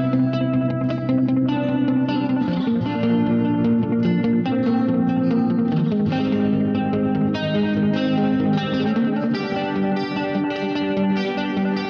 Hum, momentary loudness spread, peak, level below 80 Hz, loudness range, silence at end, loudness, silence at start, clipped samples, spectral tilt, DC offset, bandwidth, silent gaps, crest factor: none; 3 LU; -10 dBFS; -54 dBFS; 2 LU; 0 s; -21 LUFS; 0 s; under 0.1%; -8.5 dB/octave; under 0.1%; 6.4 kHz; none; 10 dB